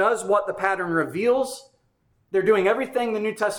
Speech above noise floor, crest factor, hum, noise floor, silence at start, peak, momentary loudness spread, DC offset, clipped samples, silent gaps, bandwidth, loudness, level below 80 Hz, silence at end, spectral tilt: 44 dB; 16 dB; none; -66 dBFS; 0 s; -8 dBFS; 6 LU; under 0.1%; under 0.1%; none; 19 kHz; -23 LUFS; -66 dBFS; 0 s; -4.5 dB/octave